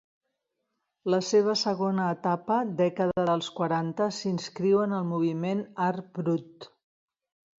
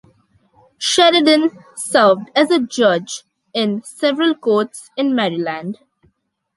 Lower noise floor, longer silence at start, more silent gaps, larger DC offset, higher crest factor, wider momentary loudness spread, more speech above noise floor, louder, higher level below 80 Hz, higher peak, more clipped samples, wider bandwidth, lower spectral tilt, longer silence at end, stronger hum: first, -81 dBFS vs -63 dBFS; first, 1.05 s vs 0.8 s; neither; neither; about the same, 16 dB vs 16 dB; second, 7 LU vs 15 LU; first, 54 dB vs 47 dB; second, -28 LUFS vs -16 LUFS; about the same, -70 dBFS vs -66 dBFS; second, -12 dBFS vs 0 dBFS; neither; second, 7.8 kHz vs 11.5 kHz; first, -6 dB/octave vs -3.5 dB/octave; about the same, 0.95 s vs 0.85 s; neither